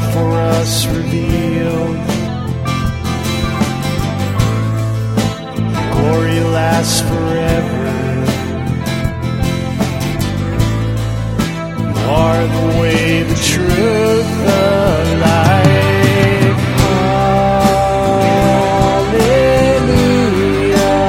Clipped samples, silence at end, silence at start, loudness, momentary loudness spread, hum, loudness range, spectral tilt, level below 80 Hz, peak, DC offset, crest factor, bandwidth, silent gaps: under 0.1%; 0 s; 0 s; -14 LUFS; 7 LU; none; 5 LU; -6 dB/octave; -28 dBFS; 0 dBFS; under 0.1%; 12 dB; 16.5 kHz; none